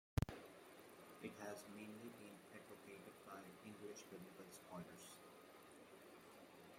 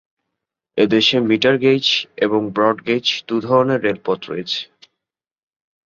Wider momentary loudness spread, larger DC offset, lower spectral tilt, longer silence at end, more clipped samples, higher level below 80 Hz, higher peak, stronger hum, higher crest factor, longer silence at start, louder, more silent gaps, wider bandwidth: about the same, 10 LU vs 9 LU; neither; about the same, -5.5 dB/octave vs -5 dB/octave; second, 0 s vs 1.2 s; neither; second, -66 dBFS vs -60 dBFS; second, -24 dBFS vs -2 dBFS; neither; first, 30 dB vs 16 dB; second, 0.15 s vs 0.75 s; second, -57 LUFS vs -17 LUFS; neither; first, 16.5 kHz vs 7.4 kHz